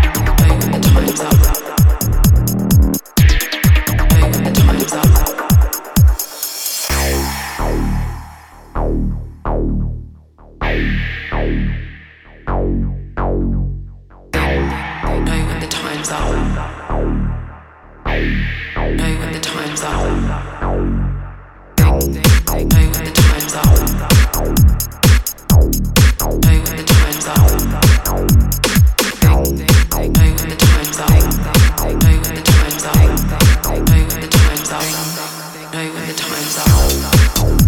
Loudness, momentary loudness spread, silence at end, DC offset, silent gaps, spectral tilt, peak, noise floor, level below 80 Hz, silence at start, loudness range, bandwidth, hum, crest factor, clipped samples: -15 LUFS; 10 LU; 0 s; under 0.1%; none; -5 dB/octave; 0 dBFS; -40 dBFS; -18 dBFS; 0 s; 8 LU; over 20 kHz; none; 14 dB; under 0.1%